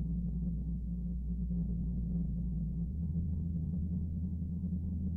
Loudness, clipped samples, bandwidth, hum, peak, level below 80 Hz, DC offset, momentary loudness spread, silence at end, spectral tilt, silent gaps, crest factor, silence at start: -37 LUFS; under 0.1%; 1 kHz; none; -26 dBFS; -40 dBFS; under 0.1%; 2 LU; 0 s; -13.5 dB/octave; none; 10 dB; 0 s